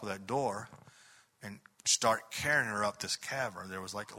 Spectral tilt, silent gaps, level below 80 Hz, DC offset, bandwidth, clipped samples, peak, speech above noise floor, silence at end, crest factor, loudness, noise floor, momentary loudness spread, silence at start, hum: -2 dB/octave; none; -70 dBFS; under 0.1%; 16 kHz; under 0.1%; -14 dBFS; 27 dB; 0 s; 22 dB; -33 LUFS; -62 dBFS; 20 LU; 0 s; none